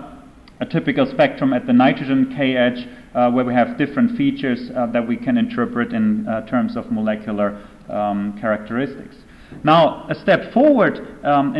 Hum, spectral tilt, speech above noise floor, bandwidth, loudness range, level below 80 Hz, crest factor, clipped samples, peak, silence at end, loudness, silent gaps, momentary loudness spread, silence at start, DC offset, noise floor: none; -8 dB/octave; 24 dB; 11 kHz; 4 LU; -50 dBFS; 14 dB; under 0.1%; -4 dBFS; 0 s; -19 LUFS; none; 9 LU; 0 s; under 0.1%; -42 dBFS